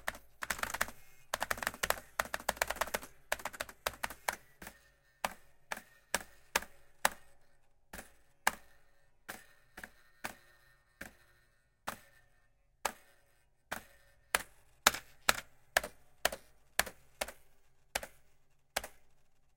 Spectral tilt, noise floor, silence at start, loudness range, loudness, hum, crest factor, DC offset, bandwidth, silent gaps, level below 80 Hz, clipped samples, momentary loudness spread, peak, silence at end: -0.5 dB/octave; -71 dBFS; 0 s; 13 LU; -38 LUFS; none; 36 dB; under 0.1%; 17 kHz; none; -62 dBFS; under 0.1%; 18 LU; -4 dBFS; 0.5 s